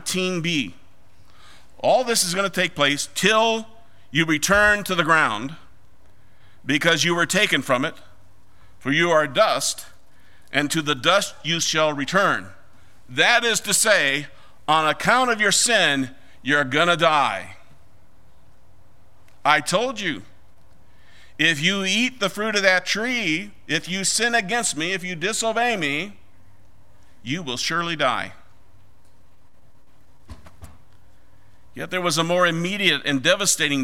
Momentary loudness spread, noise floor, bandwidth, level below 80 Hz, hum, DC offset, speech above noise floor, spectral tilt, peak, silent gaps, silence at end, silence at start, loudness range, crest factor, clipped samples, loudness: 11 LU; -58 dBFS; 16 kHz; -54 dBFS; none; 1%; 37 dB; -2.5 dB/octave; 0 dBFS; none; 0 s; 0.05 s; 7 LU; 22 dB; under 0.1%; -20 LUFS